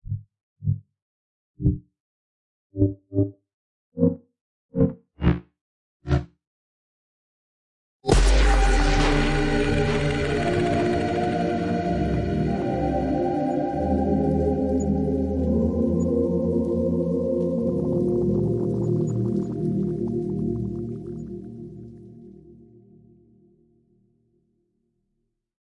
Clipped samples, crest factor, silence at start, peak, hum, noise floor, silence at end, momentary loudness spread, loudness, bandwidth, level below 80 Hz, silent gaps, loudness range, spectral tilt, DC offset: under 0.1%; 20 dB; 0.05 s; -4 dBFS; none; -76 dBFS; 3.1 s; 12 LU; -24 LUFS; 11.5 kHz; -32 dBFS; 0.43-0.56 s, 1.02-1.54 s, 2.00-2.70 s, 3.54-3.92 s, 4.41-4.69 s, 5.61-6.00 s, 6.47-8.00 s; 8 LU; -7 dB/octave; under 0.1%